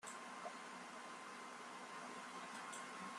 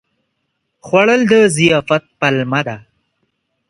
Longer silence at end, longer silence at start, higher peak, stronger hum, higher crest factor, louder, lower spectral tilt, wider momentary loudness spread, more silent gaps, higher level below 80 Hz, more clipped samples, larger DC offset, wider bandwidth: second, 0 s vs 0.9 s; second, 0 s vs 0.85 s; second, -36 dBFS vs 0 dBFS; neither; about the same, 16 dB vs 16 dB; second, -52 LUFS vs -13 LUFS; second, -2 dB/octave vs -5 dB/octave; second, 3 LU vs 9 LU; neither; second, under -90 dBFS vs -54 dBFS; neither; neither; first, 13 kHz vs 11.5 kHz